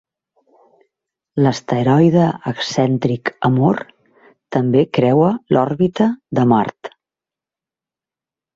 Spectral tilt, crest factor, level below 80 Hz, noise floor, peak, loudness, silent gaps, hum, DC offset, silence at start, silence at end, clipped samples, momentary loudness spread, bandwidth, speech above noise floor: -7.5 dB/octave; 16 dB; -56 dBFS; -89 dBFS; -2 dBFS; -16 LUFS; none; none; under 0.1%; 1.35 s; 1.65 s; under 0.1%; 10 LU; 7.8 kHz; 74 dB